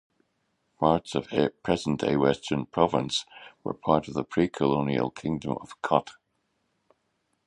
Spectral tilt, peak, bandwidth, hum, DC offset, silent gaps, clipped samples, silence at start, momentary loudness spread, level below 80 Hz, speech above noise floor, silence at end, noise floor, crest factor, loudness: -6 dB/octave; -6 dBFS; 11 kHz; none; under 0.1%; none; under 0.1%; 0.8 s; 8 LU; -56 dBFS; 49 dB; 1.35 s; -75 dBFS; 22 dB; -27 LUFS